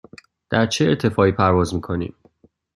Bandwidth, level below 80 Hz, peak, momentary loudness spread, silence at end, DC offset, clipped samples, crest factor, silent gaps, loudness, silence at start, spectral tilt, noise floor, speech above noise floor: 12.5 kHz; -50 dBFS; -2 dBFS; 10 LU; 0.65 s; under 0.1%; under 0.1%; 18 dB; none; -19 LUFS; 0.5 s; -6 dB/octave; -56 dBFS; 38 dB